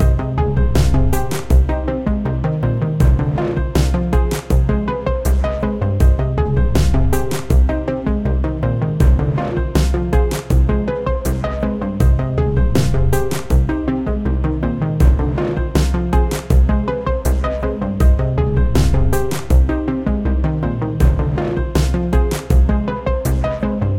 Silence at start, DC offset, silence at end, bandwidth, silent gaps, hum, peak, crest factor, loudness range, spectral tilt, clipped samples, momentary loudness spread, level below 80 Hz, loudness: 0 s; under 0.1%; 0 s; 16 kHz; none; none; 0 dBFS; 14 dB; 1 LU; -7 dB/octave; under 0.1%; 5 LU; -18 dBFS; -18 LUFS